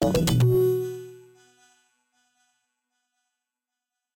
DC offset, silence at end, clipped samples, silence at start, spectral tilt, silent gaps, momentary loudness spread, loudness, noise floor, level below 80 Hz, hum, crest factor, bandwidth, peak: under 0.1%; 3 s; under 0.1%; 0 s; -6.5 dB/octave; none; 19 LU; -23 LUFS; -87 dBFS; -46 dBFS; none; 16 dB; 16.5 kHz; -12 dBFS